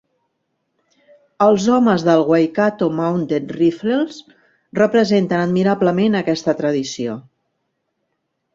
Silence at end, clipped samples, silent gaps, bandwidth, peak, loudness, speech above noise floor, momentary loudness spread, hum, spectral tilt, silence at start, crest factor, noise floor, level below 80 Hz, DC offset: 1.35 s; under 0.1%; none; 7.8 kHz; -2 dBFS; -17 LUFS; 56 dB; 9 LU; none; -6.5 dB/octave; 1.4 s; 16 dB; -73 dBFS; -60 dBFS; under 0.1%